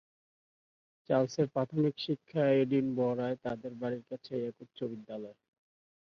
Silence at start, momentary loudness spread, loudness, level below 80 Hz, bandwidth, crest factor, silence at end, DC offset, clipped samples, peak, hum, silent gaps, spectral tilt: 1.1 s; 13 LU; -33 LUFS; -74 dBFS; 7 kHz; 18 dB; 0.8 s; under 0.1%; under 0.1%; -16 dBFS; none; none; -7.5 dB/octave